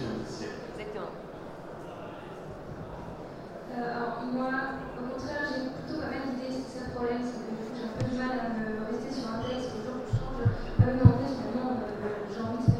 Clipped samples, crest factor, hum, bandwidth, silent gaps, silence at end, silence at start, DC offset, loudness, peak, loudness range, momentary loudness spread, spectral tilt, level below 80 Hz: under 0.1%; 28 dB; none; 9.4 kHz; none; 0 s; 0 s; under 0.1%; -32 LUFS; -4 dBFS; 11 LU; 14 LU; -7.5 dB/octave; -46 dBFS